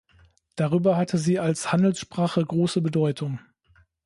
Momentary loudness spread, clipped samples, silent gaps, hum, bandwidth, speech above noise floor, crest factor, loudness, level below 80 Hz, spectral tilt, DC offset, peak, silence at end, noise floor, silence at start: 9 LU; under 0.1%; none; none; 11.5 kHz; 38 dB; 16 dB; -24 LUFS; -62 dBFS; -6.5 dB/octave; under 0.1%; -8 dBFS; 0.65 s; -61 dBFS; 0.55 s